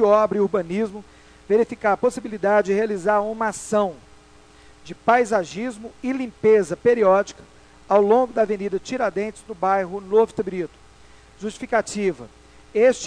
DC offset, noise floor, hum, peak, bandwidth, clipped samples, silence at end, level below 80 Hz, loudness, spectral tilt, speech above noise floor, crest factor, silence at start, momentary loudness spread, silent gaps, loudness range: under 0.1%; -49 dBFS; none; -2 dBFS; 11 kHz; under 0.1%; 0 s; -54 dBFS; -21 LUFS; -5.5 dB/octave; 29 dB; 18 dB; 0 s; 13 LU; none; 4 LU